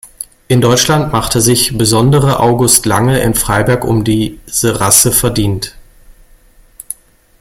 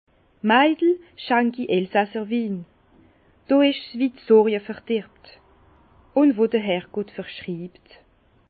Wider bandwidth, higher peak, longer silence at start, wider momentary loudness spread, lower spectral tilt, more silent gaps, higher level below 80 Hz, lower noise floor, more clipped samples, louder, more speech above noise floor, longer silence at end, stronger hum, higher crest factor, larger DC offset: first, over 20 kHz vs 4.8 kHz; first, 0 dBFS vs -4 dBFS; second, 0.05 s vs 0.45 s; about the same, 17 LU vs 15 LU; second, -4 dB/octave vs -10.5 dB/octave; neither; first, -32 dBFS vs -64 dBFS; second, -44 dBFS vs -56 dBFS; first, 0.1% vs under 0.1%; first, -10 LUFS vs -22 LUFS; about the same, 33 dB vs 35 dB; second, 0.5 s vs 0.8 s; neither; second, 12 dB vs 20 dB; neither